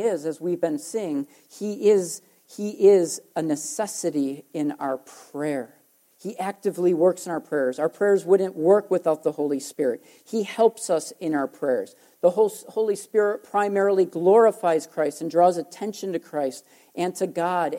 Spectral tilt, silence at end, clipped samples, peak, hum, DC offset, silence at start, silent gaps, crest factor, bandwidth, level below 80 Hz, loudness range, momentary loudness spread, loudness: -5 dB/octave; 0 s; under 0.1%; -6 dBFS; none; under 0.1%; 0 s; none; 18 dB; 16.5 kHz; -82 dBFS; 5 LU; 12 LU; -24 LUFS